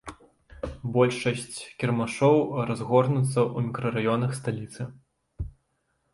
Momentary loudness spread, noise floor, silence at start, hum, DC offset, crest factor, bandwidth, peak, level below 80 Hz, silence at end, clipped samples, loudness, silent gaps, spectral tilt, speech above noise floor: 17 LU; -74 dBFS; 0.05 s; none; under 0.1%; 20 dB; 11.5 kHz; -6 dBFS; -50 dBFS; 0.65 s; under 0.1%; -26 LUFS; none; -6.5 dB/octave; 49 dB